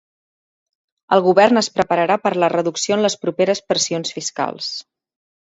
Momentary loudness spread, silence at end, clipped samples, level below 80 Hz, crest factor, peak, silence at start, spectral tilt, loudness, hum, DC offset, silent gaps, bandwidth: 10 LU; 0.8 s; under 0.1%; -62 dBFS; 18 dB; 0 dBFS; 1.1 s; -3.5 dB/octave; -18 LUFS; none; under 0.1%; none; 8 kHz